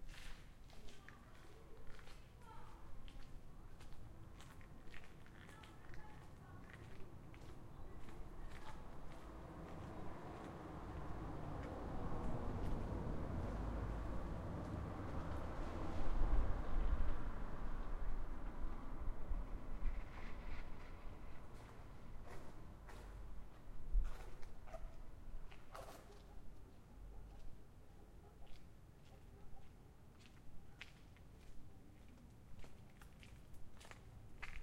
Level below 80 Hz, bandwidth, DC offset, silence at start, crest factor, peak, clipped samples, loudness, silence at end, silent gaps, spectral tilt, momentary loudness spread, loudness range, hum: -48 dBFS; 9.4 kHz; under 0.1%; 0 s; 22 dB; -24 dBFS; under 0.1%; -52 LUFS; 0 s; none; -7 dB/octave; 17 LU; 16 LU; none